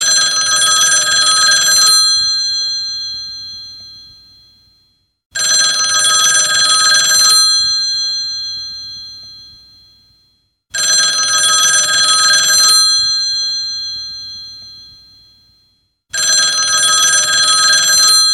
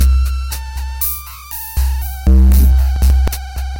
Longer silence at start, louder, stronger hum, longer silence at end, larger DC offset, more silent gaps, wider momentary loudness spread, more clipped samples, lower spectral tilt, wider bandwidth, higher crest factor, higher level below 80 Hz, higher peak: about the same, 0 s vs 0 s; first, -9 LUFS vs -15 LUFS; neither; about the same, 0 s vs 0 s; neither; first, 5.26-5.30 s vs none; first, 17 LU vs 14 LU; neither; second, 3 dB/octave vs -5.5 dB/octave; about the same, 15.5 kHz vs 17 kHz; about the same, 14 dB vs 10 dB; second, -54 dBFS vs -14 dBFS; about the same, 0 dBFS vs -2 dBFS